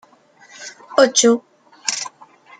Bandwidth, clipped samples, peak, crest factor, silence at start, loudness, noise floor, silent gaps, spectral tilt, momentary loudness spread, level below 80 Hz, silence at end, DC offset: 10 kHz; under 0.1%; 0 dBFS; 20 dB; 0.6 s; -17 LUFS; -50 dBFS; none; -1.5 dB/octave; 23 LU; -74 dBFS; 0.5 s; under 0.1%